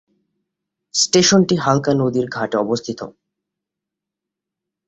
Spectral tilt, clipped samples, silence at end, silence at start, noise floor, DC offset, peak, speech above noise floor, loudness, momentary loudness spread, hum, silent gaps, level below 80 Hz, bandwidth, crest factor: -4 dB/octave; under 0.1%; 1.8 s; 0.95 s; -84 dBFS; under 0.1%; -2 dBFS; 67 dB; -17 LUFS; 14 LU; none; none; -56 dBFS; 8.4 kHz; 18 dB